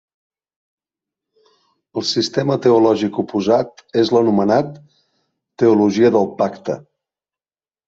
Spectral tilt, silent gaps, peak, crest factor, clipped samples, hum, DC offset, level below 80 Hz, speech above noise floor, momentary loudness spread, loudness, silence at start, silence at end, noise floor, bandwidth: -6 dB/octave; none; -2 dBFS; 16 dB; under 0.1%; none; under 0.1%; -60 dBFS; over 74 dB; 11 LU; -16 LUFS; 1.95 s; 1.1 s; under -90 dBFS; 7.8 kHz